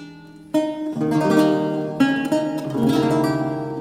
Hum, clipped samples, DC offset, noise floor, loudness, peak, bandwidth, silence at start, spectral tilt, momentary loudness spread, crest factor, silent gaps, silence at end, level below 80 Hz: none; under 0.1%; under 0.1%; -41 dBFS; -20 LUFS; -4 dBFS; 15.5 kHz; 0 s; -6.5 dB/octave; 8 LU; 16 dB; none; 0 s; -56 dBFS